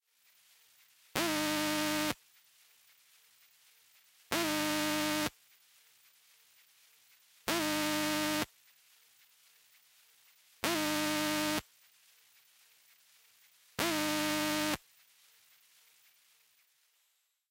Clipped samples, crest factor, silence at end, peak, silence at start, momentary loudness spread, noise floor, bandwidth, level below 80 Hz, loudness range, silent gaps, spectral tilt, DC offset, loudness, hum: under 0.1%; 28 dB; 2.75 s; -10 dBFS; 1.15 s; 7 LU; -77 dBFS; 16 kHz; -68 dBFS; 1 LU; none; -2.5 dB/octave; under 0.1%; -33 LUFS; none